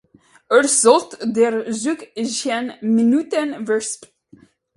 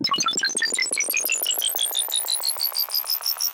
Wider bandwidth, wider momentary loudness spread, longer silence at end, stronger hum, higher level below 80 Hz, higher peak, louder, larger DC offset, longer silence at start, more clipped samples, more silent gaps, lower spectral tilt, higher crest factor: second, 11.5 kHz vs 17.5 kHz; first, 11 LU vs 2 LU; first, 0.7 s vs 0 s; neither; first, -68 dBFS vs -78 dBFS; first, 0 dBFS vs -12 dBFS; first, -18 LUFS vs -21 LUFS; neither; first, 0.5 s vs 0 s; neither; neither; first, -3 dB/octave vs 1.5 dB/octave; first, 18 dB vs 12 dB